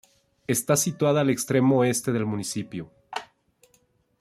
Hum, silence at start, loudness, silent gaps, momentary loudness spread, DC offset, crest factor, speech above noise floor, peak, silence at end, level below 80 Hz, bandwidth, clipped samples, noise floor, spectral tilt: none; 0.5 s; -24 LUFS; none; 16 LU; under 0.1%; 18 dB; 42 dB; -8 dBFS; 0.95 s; -64 dBFS; 15.5 kHz; under 0.1%; -65 dBFS; -5 dB/octave